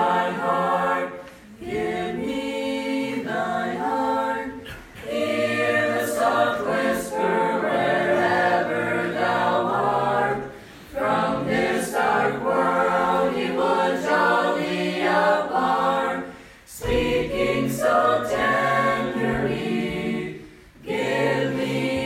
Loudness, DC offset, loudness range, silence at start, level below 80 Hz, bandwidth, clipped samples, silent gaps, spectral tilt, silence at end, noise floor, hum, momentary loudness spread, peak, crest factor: -23 LUFS; under 0.1%; 4 LU; 0 s; -48 dBFS; 16 kHz; under 0.1%; none; -5 dB/octave; 0 s; -44 dBFS; none; 10 LU; -8 dBFS; 16 dB